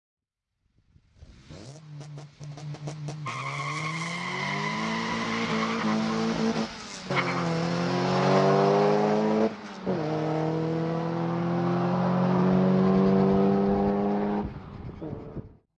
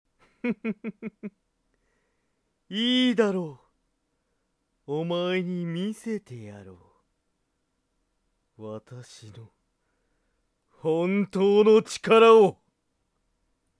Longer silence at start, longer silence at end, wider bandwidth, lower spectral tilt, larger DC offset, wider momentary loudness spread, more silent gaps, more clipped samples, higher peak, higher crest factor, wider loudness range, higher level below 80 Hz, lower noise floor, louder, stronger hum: first, 1.2 s vs 0.45 s; second, 0.25 s vs 1.25 s; second, 9.8 kHz vs 11 kHz; about the same, -6.5 dB/octave vs -5.5 dB/octave; neither; second, 19 LU vs 24 LU; neither; neither; second, -10 dBFS vs -6 dBFS; second, 16 dB vs 22 dB; second, 11 LU vs 26 LU; first, -54 dBFS vs -74 dBFS; about the same, -78 dBFS vs -76 dBFS; second, -26 LUFS vs -23 LUFS; neither